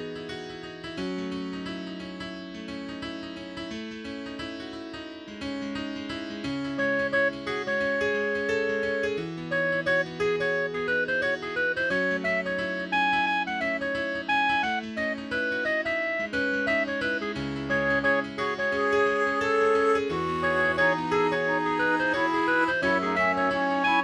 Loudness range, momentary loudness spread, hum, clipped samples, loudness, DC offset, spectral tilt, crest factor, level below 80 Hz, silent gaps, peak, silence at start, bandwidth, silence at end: 11 LU; 13 LU; none; under 0.1%; -26 LUFS; under 0.1%; -5 dB/octave; 16 dB; -56 dBFS; none; -12 dBFS; 0 s; 11 kHz; 0 s